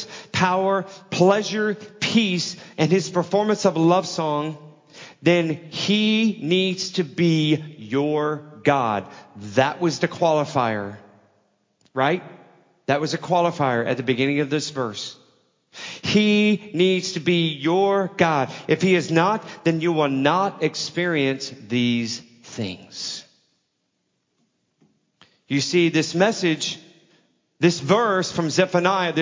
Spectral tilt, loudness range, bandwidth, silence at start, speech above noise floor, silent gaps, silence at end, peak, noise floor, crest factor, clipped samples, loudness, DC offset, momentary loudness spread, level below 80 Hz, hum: -5 dB/octave; 5 LU; 7.6 kHz; 0 s; 52 dB; none; 0 s; -2 dBFS; -73 dBFS; 20 dB; under 0.1%; -21 LUFS; under 0.1%; 11 LU; -64 dBFS; none